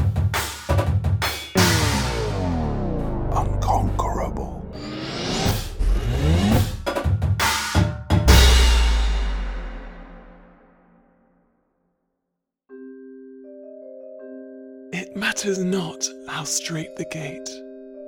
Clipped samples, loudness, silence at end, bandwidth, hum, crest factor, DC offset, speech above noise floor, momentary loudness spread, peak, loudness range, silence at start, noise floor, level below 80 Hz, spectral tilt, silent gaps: under 0.1%; -22 LUFS; 0 s; over 20 kHz; none; 22 dB; under 0.1%; 54 dB; 22 LU; 0 dBFS; 17 LU; 0 s; -81 dBFS; -26 dBFS; -4.5 dB/octave; none